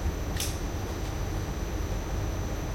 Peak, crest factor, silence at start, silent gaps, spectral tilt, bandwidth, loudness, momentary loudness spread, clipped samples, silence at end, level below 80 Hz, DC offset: -18 dBFS; 14 dB; 0 s; none; -5 dB/octave; 16.5 kHz; -33 LUFS; 3 LU; under 0.1%; 0 s; -34 dBFS; under 0.1%